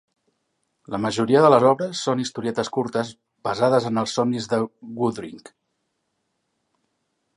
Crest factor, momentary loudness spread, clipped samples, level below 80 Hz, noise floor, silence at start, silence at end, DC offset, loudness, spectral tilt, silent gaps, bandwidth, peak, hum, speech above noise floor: 22 dB; 15 LU; under 0.1%; -64 dBFS; -75 dBFS; 0.9 s; 2 s; under 0.1%; -22 LUFS; -5.5 dB/octave; none; 11.5 kHz; -2 dBFS; none; 54 dB